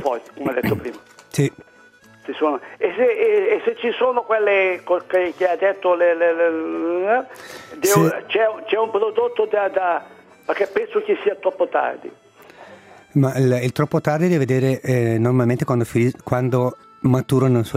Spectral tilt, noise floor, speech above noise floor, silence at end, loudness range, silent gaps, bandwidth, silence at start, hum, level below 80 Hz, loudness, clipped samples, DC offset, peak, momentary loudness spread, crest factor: -6.5 dB/octave; -49 dBFS; 30 dB; 0 s; 3 LU; none; 16 kHz; 0 s; none; -58 dBFS; -20 LUFS; under 0.1%; under 0.1%; -2 dBFS; 8 LU; 18 dB